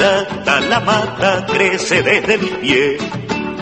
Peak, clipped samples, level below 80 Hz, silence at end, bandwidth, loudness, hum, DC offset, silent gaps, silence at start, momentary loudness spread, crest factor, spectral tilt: 0 dBFS; under 0.1%; -46 dBFS; 0 s; 8.8 kHz; -15 LUFS; none; under 0.1%; none; 0 s; 8 LU; 16 dB; -4 dB/octave